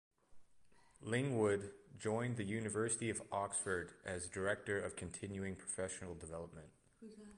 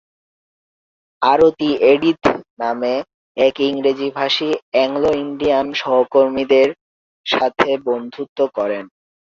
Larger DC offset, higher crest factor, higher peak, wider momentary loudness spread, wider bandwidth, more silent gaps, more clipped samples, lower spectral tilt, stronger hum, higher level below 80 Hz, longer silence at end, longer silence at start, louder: neither; about the same, 18 dB vs 16 dB; second, -24 dBFS vs -2 dBFS; first, 16 LU vs 9 LU; first, 11.5 kHz vs 7.4 kHz; second, none vs 2.50-2.57 s, 3.14-3.35 s, 4.62-4.72 s, 6.81-7.24 s, 8.29-8.36 s; neither; about the same, -4.5 dB/octave vs -5 dB/octave; neither; second, -66 dBFS vs -54 dBFS; second, 0 s vs 0.35 s; second, 0.3 s vs 1.2 s; second, -41 LUFS vs -17 LUFS